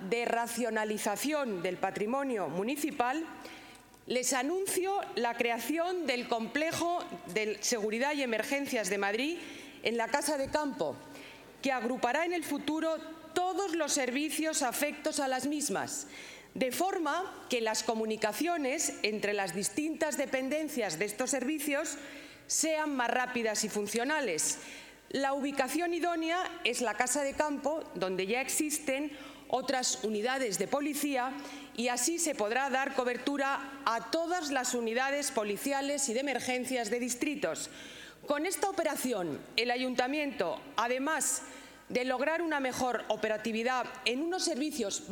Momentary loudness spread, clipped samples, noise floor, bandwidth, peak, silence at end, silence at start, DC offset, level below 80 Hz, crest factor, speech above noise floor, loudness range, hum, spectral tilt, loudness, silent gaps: 6 LU; under 0.1%; -53 dBFS; 18 kHz; -10 dBFS; 0 s; 0 s; under 0.1%; -70 dBFS; 22 dB; 20 dB; 2 LU; none; -2.5 dB/octave; -32 LUFS; none